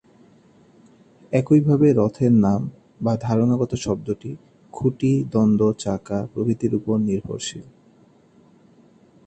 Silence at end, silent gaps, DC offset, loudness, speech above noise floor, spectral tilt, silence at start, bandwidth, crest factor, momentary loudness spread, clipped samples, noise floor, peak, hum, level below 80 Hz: 1.65 s; none; under 0.1%; -21 LUFS; 34 dB; -7.5 dB/octave; 1.3 s; 8.8 kHz; 18 dB; 13 LU; under 0.1%; -54 dBFS; -4 dBFS; none; -52 dBFS